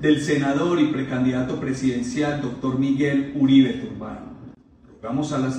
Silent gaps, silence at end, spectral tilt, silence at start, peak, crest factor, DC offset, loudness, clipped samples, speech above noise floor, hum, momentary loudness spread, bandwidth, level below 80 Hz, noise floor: none; 0 s; -6.5 dB/octave; 0 s; -6 dBFS; 16 dB; under 0.1%; -22 LUFS; under 0.1%; 29 dB; none; 16 LU; 9.4 kHz; -52 dBFS; -50 dBFS